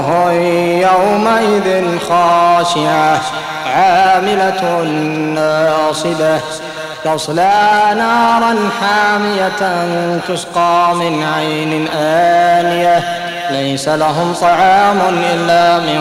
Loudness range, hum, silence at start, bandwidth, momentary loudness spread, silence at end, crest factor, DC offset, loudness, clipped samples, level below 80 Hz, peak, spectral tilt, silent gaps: 2 LU; none; 0 s; 16 kHz; 7 LU; 0 s; 10 dB; under 0.1%; -12 LUFS; under 0.1%; -52 dBFS; -2 dBFS; -4.5 dB/octave; none